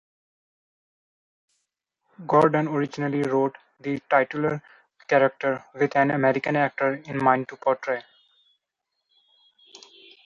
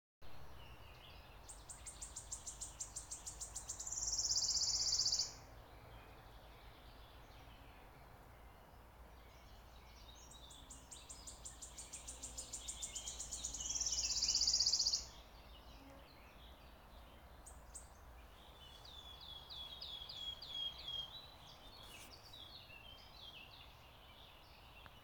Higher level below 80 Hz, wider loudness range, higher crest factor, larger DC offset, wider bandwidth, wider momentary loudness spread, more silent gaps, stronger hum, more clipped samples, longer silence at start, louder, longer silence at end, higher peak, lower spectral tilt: second, -68 dBFS vs -62 dBFS; second, 4 LU vs 22 LU; about the same, 22 dB vs 24 dB; neither; second, 10.5 kHz vs 19 kHz; second, 10 LU vs 26 LU; neither; neither; neither; first, 2.2 s vs 0.2 s; first, -24 LUFS vs -40 LUFS; first, 2.25 s vs 0 s; first, -4 dBFS vs -22 dBFS; first, -7.5 dB/octave vs 0 dB/octave